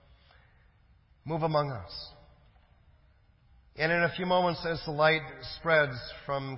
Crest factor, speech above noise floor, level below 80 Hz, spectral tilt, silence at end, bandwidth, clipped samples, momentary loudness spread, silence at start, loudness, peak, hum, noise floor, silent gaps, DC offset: 20 dB; 33 dB; -58 dBFS; -9 dB/octave; 0 s; 5.8 kHz; under 0.1%; 15 LU; 1.25 s; -29 LUFS; -12 dBFS; none; -63 dBFS; none; under 0.1%